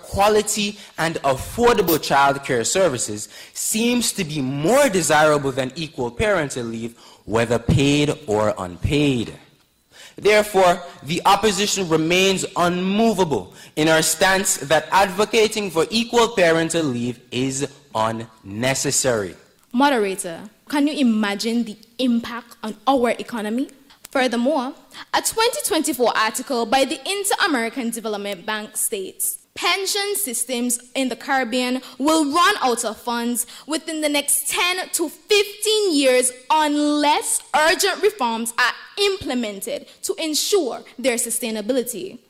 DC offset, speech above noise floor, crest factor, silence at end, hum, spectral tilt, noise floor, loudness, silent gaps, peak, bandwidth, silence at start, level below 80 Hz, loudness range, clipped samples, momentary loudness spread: under 0.1%; 36 dB; 16 dB; 0.15 s; none; -3 dB/octave; -56 dBFS; -20 LUFS; none; -6 dBFS; 16 kHz; 0.05 s; -48 dBFS; 4 LU; under 0.1%; 10 LU